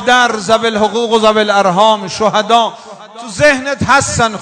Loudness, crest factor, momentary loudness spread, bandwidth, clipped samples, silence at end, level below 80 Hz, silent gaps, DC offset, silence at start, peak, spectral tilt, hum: -11 LUFS; 12 dB; 4 LU; 11 kHz; 0.8%; 0 s; -44 dBFS; none; under 0.1%; 0 s; 0 dBFS; -3.5 dB/octave; none